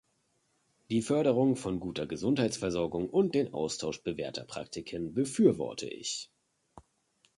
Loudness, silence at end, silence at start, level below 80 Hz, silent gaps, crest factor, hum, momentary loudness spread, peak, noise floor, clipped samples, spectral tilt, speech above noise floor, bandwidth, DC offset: -31 LUFS; 0.6 s; 0.9 s; -62 dBFS; none; 20 dB; none; 12 LU; -10 dBFS; -75 dBFS; under 0.1%; -5.5 dB/octave; 44 dB; 11.5 kHz; under 0.1%